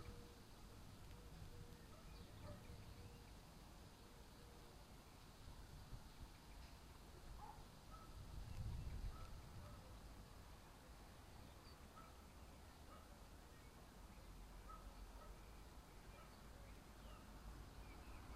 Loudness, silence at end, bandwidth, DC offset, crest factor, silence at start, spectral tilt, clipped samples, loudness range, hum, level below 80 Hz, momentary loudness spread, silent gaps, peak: -61 LUFS; 0 s; 15.5 kHz; under 0.1%; 20 dB; 0 s; -5 dB/octave; under 0.1%; 5 LU; none; -60 dBFS; 5 LU; none; -38 dBFS